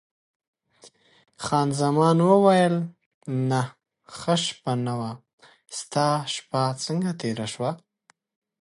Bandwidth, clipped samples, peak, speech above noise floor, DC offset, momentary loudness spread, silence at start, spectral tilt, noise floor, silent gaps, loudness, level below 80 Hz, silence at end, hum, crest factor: 11.5 kHz; under 0.1%; -4 dBFS; 41 dB; under 0.1%; 18 LU; 0.85 s; -5.5 dB/octave; -65 dBFS; 3.06-3.21 s, 5.33-5.38 s; -24 LUFS; -66 dBFS; 0.85 s; none; 20 dB